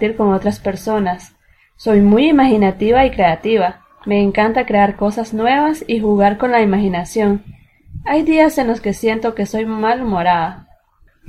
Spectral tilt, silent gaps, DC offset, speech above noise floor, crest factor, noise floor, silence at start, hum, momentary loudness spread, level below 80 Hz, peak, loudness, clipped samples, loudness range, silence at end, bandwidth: -6.5 dB/octave; none; under 0.1%; 38 dB; 14 dB; -53 dBFS; 0 s; none; 9 LU; -38 dBFS; 0 dBFS; -15 LUFS; under 0.1%; 3 LU; 0.7 s; 14.5 kHz